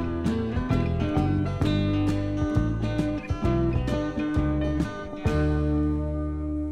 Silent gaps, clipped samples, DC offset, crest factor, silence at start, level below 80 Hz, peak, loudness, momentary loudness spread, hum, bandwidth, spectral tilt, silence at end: none; under 0.1%; under 0.1%; 16 dB; 0 s; -32 dBFS; -10 dBFS; -26 LUFS; 4 LU; none; 11 kHz; -8 dB/octave; 0 s